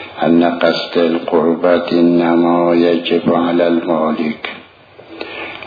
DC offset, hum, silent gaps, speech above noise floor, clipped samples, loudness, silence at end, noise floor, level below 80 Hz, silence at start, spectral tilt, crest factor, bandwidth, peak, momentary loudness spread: under 0.1%; none; none; 28 dB; under 0.1%; -14 LUFS; 0 s; -41 dBFS; -58 dBFS; 0 s; -7.5 dB/octave; 14 dB; 5 kHz; 0 dBFS; 13 LU